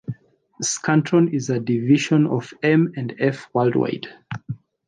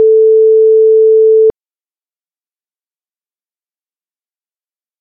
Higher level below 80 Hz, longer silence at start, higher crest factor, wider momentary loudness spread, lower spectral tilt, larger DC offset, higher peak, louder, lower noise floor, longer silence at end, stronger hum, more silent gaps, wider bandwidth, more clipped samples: second, -64 dBFS vs -58 dBFS; about the same, 0.1 s vs 0 s; first, 16 dB vs 8 dB; first, 16 LU vs 2 LU; first, -5.5 dB/octave vs -0.5 dB/octave; neither; about the same, -4 dBFS vs -2 dBFS; second, -20 LUFS vs -7 LUFS; second, -39 dBFS vs under -90 dBFS; second, 0.35 s vs 3.5 s; neither; neither; first, 10 kHz vs 1 kHz; neither